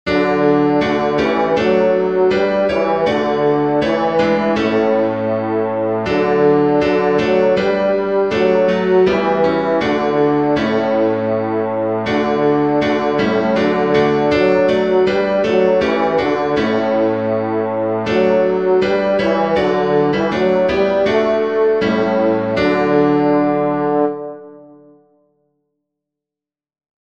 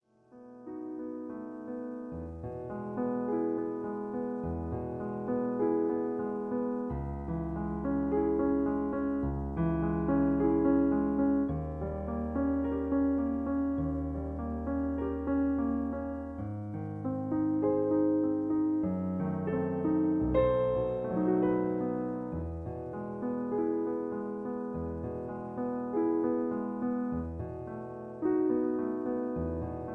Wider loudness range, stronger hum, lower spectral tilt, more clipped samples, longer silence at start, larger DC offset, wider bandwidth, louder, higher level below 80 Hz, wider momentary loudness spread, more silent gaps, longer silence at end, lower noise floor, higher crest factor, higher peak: second, 2 LU vs 6 LU; neither; second, -7 dB/octave vs -11.5 dB/octave; neither; second, 0.05 s vs 0.35 s; first, 0.3% vs under 0.1%; first, 8 kHz vs 4 kHz; first, -15 LUFS vs -32 LUFS; about the same, -46 dBFS vs -48 dBFS; second, 4 LU vs 11 LU; neither; first, 2.4 s vs 0 s; first, -88 dBFS vs -55 dBFS; about the same, 14 dB vs 16 dB; first, -2 dBFS vs -14 dBFS